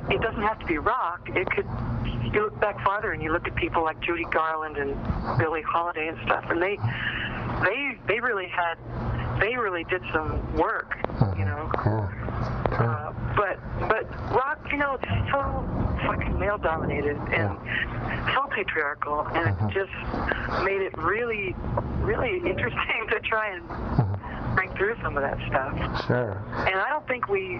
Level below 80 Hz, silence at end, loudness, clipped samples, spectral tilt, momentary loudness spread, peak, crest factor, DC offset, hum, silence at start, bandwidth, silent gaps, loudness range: -38 dBFS; 0 s; -27 LUFS; under 0.1%; -4.5 dB/octave; 4 LU; -6 dBFS; 20 dB; under 0.1%; none; 0 s; 6 kHz; none; 1 LU